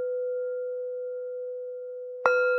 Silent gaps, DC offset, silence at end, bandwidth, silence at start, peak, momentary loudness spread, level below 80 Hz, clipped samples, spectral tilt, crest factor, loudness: none; under 0.1%; 0 s; 6 kHz; 0 s; -6 dBFS; 12 LU; under -90 dBFS; under 0.1%; -3 dB/octave; 24 dB; -31 LUFS